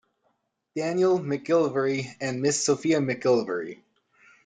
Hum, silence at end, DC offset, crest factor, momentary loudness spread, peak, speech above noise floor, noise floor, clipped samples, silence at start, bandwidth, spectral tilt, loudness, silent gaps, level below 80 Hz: none; 0.7 s; under 0.1%; 16 dB; 9 LU; -10 dBFS; 49 dB; -73 dBFS; under 0.1%; 0.75 s; 9.6 kHz; -4.5 dB/octave; -25 LUFS; none; -70 dBFS